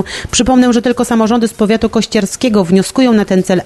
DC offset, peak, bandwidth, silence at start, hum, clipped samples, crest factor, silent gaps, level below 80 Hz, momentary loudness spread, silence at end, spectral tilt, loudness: under 0.1%; 0 dBFS; 12.5 kHz; 0 s; none; under 0.1%; 12 dB; none; -36 dBFS; 4 LU; 0 s; -5 dB/octave; -11 LUFS